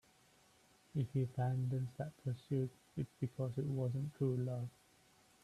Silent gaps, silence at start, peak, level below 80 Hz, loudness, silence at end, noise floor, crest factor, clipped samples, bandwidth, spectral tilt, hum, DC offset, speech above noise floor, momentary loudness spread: none; 0.95 s; -26 dBFS; -72 dBFS; -41 LUFS; 0.75 s; -69 dBFS; 16 dB; under 0.1%; 12 kHz; -9 dB/octave; none; under 0.1%; 30 dB; 7 LU